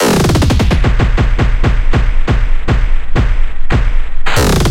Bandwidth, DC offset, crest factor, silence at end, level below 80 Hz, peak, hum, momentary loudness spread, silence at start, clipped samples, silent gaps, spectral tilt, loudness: 16 kHz; under 0.1%; 8 dB; 0 s; -12 dBFS; 0 dBFS; none; 6 LU; 0 s; under 0.1%; none; -5.5 dB/octave; -14 LUFS